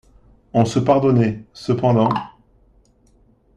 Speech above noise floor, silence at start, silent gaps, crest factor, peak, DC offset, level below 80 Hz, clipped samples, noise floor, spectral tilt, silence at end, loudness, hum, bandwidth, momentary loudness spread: 39 dB; 0.55 s; none; 18 dB; -2 dBFS; under 0.1%; -50 dBFS; under 0.1%; -55 dBFS; -7.5 dB/octave; 1.3 s; -18 LUFS; none; 10 kHz; 11 LU